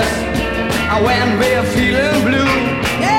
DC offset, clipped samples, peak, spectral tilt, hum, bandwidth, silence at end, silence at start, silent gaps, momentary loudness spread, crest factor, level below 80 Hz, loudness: under 0.1%; under 0.1%; -2 dBFS; -5 dB/octave; none; 16.5 kHz; 0 s; 0 s; none; 4 LU; 14 dB; -30 dBFS; -15 LUFS